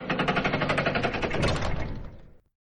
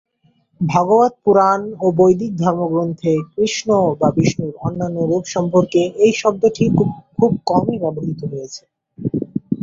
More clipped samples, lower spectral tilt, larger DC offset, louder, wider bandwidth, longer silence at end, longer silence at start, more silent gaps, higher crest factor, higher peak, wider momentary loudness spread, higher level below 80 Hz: neither; about the same, -5.5 dB/octave vs -6.5 dB/octave; neither; second, -27 LUFS vs -17 LUFS; first, 11 kHz vs 7.8 kHz; first, 0.3 s vs 0 s; second, 0 s vs 0.6 s; neither; about the same, 16 dB vs 16 dB; second, -12 dBFS vs -2 dBFS; about the same, 12 LU vs 10 LU; first, -38 dBFS vs -50 dBFS